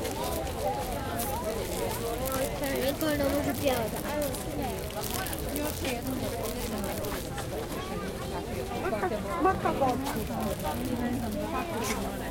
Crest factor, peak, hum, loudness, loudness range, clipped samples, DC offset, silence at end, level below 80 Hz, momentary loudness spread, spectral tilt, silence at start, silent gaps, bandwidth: 20 dB; -10 dBFS; none; -31 LUFS; 3 LU; under 0.1%; under 0.1%; 0 s; -44 dBFS; 7 LU; -4.5 dB/octave; 0 s; none; 17 kHz